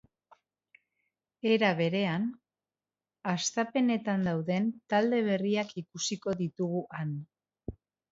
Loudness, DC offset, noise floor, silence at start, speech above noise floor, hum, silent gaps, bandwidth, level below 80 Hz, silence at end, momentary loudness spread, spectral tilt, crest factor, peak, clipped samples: -30 LUFS; under 0.1%; under -90 dBFS; 1.45 s; over 60 dB; none; none; 8 kHz; -64 dBFS; 0.4 s; 12 LU; -5 dB/octave; 20 dB; -12 dBFS; under 0.1%